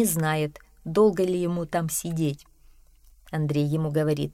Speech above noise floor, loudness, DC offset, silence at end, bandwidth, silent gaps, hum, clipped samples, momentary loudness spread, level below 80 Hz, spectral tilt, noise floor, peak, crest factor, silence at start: 30 dB; -25 LUFS; under 0.1%; 0 s; 16 kHz; none; none; under 0.1%; 10 LU; -54 dBFS; -6 dB/octave; -54 dBFS; -10 dBFS; 16 dB; 0 s